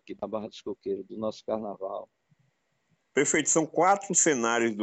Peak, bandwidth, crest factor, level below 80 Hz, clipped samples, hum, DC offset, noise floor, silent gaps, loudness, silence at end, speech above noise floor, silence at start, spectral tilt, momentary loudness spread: -8 dBFS; 9 kHz; 20 dB; -70 dBFS; under 0.1%; none; under 0.1%; -73 dBFS; none; -27 LUFS; 0 s; 46 dB; 0.1 s; -3 dB/octave; 15 LU